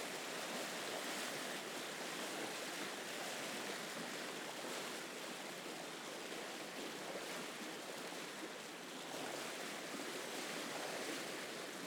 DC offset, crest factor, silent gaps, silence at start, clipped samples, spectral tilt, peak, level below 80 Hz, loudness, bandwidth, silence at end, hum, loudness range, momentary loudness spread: under 0.1%; 14 dB; none; 0 s; under 0.1%; -1.5 dB/octave; -32 dBFS; under -90 dBFS; -45 LUFS; over 20 kHz; 0 s; none; 3 LU; 4 LU